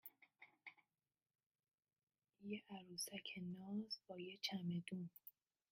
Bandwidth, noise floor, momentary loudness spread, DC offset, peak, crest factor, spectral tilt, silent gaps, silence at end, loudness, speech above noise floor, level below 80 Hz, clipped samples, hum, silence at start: 15.5 kHz; under -90 dBFS; 16 LU; under 0.1%; -30 dBFS; 22 dB; -4.5 dB/octave; 1.46-1.51 s, 1.74-1.78 s, 2.03-2.07 s; 0.4 s; -50 LUFS; over 40 dB; under -90 dBFS; under 0.1%; none; 0.05 s